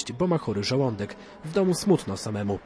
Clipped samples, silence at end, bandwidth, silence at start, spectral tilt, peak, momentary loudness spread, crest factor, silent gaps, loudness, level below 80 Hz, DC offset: under 0.1%; 0 s; 11 kHz; 0 s; -6 dB/octave; -10 dBFS; 10 LU; 16 dB; none; -26 LUFS; -56 dBFS; under 0.1%